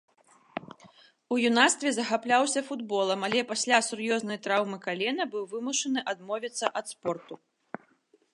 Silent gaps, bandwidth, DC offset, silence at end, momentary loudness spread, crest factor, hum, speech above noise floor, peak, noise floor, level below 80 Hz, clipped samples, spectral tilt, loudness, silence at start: none; 11.5 kHz; under 0.1%; 1 s; 18 LU; 24 dB; none; 38 dB; -6 dBFS; -66 dBFS; -80 dBFS; under 0.1%; -2 dB/octave; -28 LUFS; 0.55 s